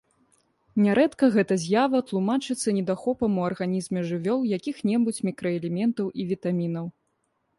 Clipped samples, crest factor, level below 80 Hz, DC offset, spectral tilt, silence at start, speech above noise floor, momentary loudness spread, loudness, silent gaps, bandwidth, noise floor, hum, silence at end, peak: under 0.1%; 16 dB; -64 dBFS; under 0.1%; -6.5 dB/octave; 0.75 s; 49 dB; 8 LU; -25 LUFS; none; 11.5 kHz; -73 dBFS; none; 0.7 s; -8 dBFS